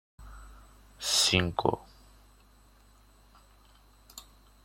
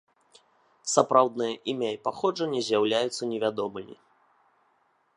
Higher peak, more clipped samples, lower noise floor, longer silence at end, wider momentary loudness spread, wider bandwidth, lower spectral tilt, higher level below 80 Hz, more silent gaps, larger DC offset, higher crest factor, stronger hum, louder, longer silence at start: second, -8 dBFS vs -4 dBFS; neither; second, -59 dBFS vs -68 dBFS; second, 0.45 s vs 1.25 s; first, 28 LU vs 12 LU; first, 16.5 kHz vs 11.5 kHz; about the same, -2.5 dB/octave vs -3.5 dB/octave; first, -56 dBFS vs -76 dBFS; neither; neither; about the same, 28 dB vs 24 dB; neither; about the same, -27 LUFS vs -27 LUFS; second, 0.2 s vs 0.85 s